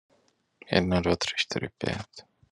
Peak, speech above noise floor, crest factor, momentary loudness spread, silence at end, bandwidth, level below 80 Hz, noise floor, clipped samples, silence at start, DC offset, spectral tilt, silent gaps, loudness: -4 dBFS; 40 dB; 26 dB; 10 LU; 0.3 s; 11 kHz; -58 dBFS; -68 dBFS; under 0.1%; 0.7 s; under 0.1%; -5 dB/octave; none; -28 LUFS